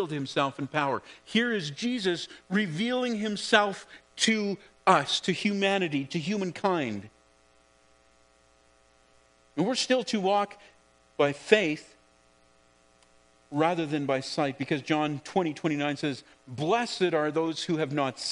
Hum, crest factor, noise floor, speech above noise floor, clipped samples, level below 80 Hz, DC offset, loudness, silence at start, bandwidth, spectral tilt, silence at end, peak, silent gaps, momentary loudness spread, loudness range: none; 26 dB; -63 dBFS; 35 dB; under 0.1%; -72 dBFS; under 0.1%; -28 LUFS; 0 s; 10.5 kHz; -4.5 dB/octave; 0 s; -4 dBFS; none; 10 LU; 6 LU